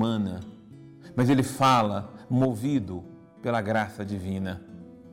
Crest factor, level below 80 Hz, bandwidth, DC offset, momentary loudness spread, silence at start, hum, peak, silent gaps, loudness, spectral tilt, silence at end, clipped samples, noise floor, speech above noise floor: 14 dB; -60 dBFS; 16.5 kHz; under 0.1%; 19 LU; 0 s; none; -14 dBFS; none; -27 LUFS; -6.5 dB/octave; 0 s; under 0.1%; -48 dBFS; 22 dB